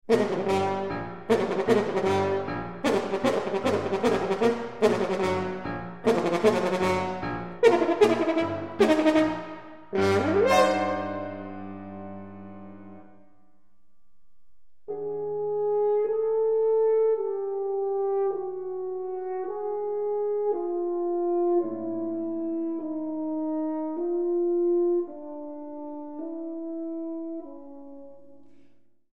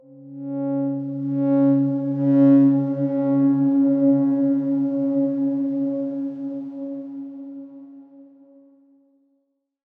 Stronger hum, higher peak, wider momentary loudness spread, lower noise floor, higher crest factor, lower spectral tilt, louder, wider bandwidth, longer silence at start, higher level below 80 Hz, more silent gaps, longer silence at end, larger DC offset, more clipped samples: neither; about the same, -6 dBFS vs -6 dBFS; about the same, 16 LU vs 18 LU; second, -67 dBFS vs -71 dBFS; first, 20 dB vs 14 dB; second, -6 dB/octave vs -12.5 dB/octave; second, -26 LUFS vs -20 LUFS; first, 13.5 kHz vs 2.2 kHz; about the same, 0.1 s vs 0.1 s; first, -60 dBFS vs -82 dBFS; neither; second, 0 s vs 1.75 s; first, 0.5% vs under 0.1%; neither